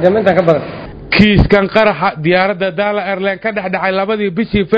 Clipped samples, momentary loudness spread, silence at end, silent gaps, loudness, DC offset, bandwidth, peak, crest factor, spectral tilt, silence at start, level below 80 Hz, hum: 0.5%; 7 LU; 0 s; none; -13 LUFS; under 0.1%; 8 kHz; 0 dBFS; 12 dB; -8 dB/octave; 0 s; -28 dBFS; none